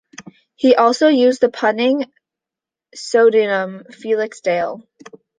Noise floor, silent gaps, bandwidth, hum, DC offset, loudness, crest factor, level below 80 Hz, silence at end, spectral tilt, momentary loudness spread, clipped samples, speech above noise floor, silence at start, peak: -87 dBFS; none; 9.6 kHz; none; under 0.1%; -16 LUFS; 16 dB; -68 dBFS; 0.6 s; -4.5 dB/octave; 16 LU; under 0.1%; 71 dB; 0.2 s; -2 dBFS